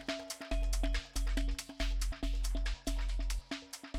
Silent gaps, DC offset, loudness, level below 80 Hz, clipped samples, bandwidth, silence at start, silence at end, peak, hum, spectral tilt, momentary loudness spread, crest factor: none; under 0.1%; -39 LUFS; -36 dBFS; under 0.1%; 15 kHz; 0 s; 0 s; -22 dBFS; none; -4 dB/octave; 4 LU; 14 dB